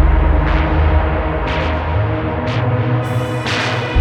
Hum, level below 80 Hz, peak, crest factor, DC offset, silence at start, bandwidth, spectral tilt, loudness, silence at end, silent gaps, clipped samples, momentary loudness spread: none; -18 dBFS; -2 dBFS; 14 dB; under 0.1%; 0 s; 9.4 kHz; -7 dB/octave; -17 LUFS; 0 s; none; under 0.1%; 4 LU